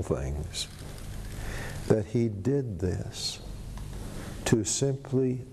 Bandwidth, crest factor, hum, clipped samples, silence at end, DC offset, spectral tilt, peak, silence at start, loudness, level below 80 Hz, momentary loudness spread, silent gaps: 13 kHz; 20 dB; none; under 0.1%; 0 s; under 0.1%; -5 dB/octave; -10 dBFS; 0 s; -30 LUFS; -42 dBFS; 14 LU; none